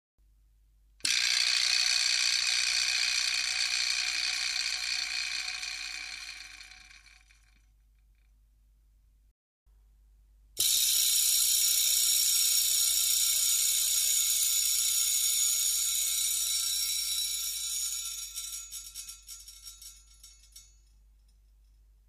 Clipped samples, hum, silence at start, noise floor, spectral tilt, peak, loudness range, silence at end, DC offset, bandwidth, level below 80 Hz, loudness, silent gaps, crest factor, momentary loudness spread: under 0.1%; none; 1.05 s; -63 dBFS; 4.5 dB/octave; -12 dBFS; 16 LU; 1.45 s; under 0.1%; 15.5 kHz; -62 dBFS; -26 LUFS; 9.31-9.66 s; 20 dB; 17 LU